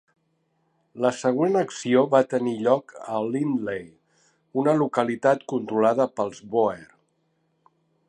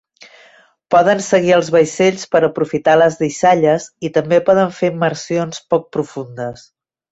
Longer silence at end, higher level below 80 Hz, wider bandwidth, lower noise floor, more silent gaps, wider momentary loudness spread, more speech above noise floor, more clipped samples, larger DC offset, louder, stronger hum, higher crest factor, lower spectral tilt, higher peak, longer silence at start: first, 1.25 s vs 0.6 s; second, -70 dBFS vs -58 dBFS; first, 10 kHz vs 8.2 kHz; first, -71 dBFS vs -49 dBFS; neither; about the same, 9 LU vs 11 LU; first, 48 dB vs 34 dB; neither; neither; second, -24 LUFS vs -15 LUFS; neither; first, 20 dB vs 14 dB; about the same, -6 dB/octave vs -5 dB/octave; about the same, -4 dBFS vs -2 dBFS; about the same, 0.95 s vs 0.9 s